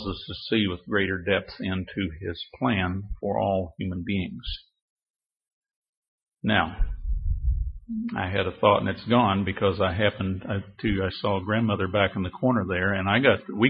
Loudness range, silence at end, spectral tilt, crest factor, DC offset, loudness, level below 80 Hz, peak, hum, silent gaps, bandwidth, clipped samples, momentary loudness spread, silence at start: 7 LU; 0 s; -10.5 dB/octave; 22 dB; under 0.1%; -26 LUFS; -36 dBFS; -4 dBFS; none; 4.82-4.96 s, 5.10-5.14 s, 5.52-5.61 s, 5.76-5.82 s, 5.89-6.18 s; 5.6 kHz; under 0.1%; 11 LU; 0 s